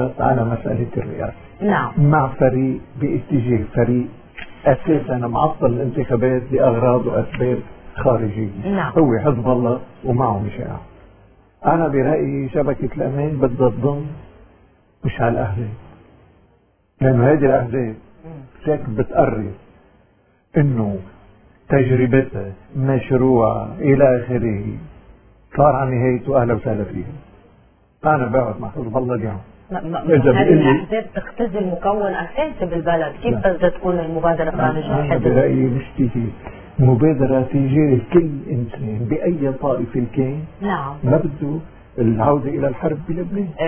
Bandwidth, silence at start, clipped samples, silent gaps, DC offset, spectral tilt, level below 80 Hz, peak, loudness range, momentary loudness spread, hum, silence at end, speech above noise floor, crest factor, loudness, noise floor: 3.5 kHz; 0 s; under 0.1%; none; under 0.1%; -12.5 dB/octave; -40 dBFS; 0 dBFS; 4 LU; 12 LU; none; 0 s; 40 dB; 18 dB; -19 LUFS; -58 dBFS